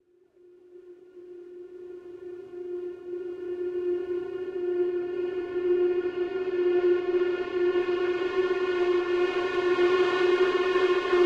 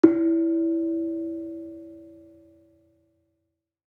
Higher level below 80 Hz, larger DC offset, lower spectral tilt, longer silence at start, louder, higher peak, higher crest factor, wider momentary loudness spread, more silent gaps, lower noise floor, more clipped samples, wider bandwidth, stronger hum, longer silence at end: first, -64 dBFS vs -74 dBFS; neither; second, -5.5 dB/octave vs -9 dB/octave; first, 0.7 s vs 0.05 s; about the same, -27 LUFS vs -25 LUFS; second, -12 dBFS vs -2 dBFS; second, 14 dB vs 26 dB; second, 18 LU vs 21 LU; neither; second, -59 dBFS vs -79 dBFS; neither; first, 7.2 kHz vs 2.7 kHz; neither; second, 0 s vs 1.8 s